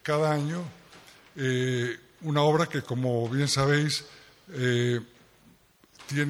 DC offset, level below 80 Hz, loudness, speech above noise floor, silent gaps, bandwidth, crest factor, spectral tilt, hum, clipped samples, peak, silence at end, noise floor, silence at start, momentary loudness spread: under 0.1%; -62 dBFS; -27 LUFS; 33 dB; none; 15.5 kHz; 18 dB; -5.5 dB/octave; none; under 0.1%; -10 dBFS; 0 s; -59 dBFS; 0.05 s; 15 LU